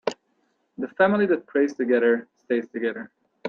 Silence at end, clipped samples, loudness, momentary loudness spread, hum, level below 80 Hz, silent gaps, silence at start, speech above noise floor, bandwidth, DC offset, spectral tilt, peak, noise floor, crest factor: 0 s; under 0.1%; -23 LUFS; 14 LU; none; -72 dBFS; none; 0.05 s; 47 dB; 7.6 kHz; under 0.1%; -6.5 dB/octave; -6 dBFS; -70 dBFS; 18 dB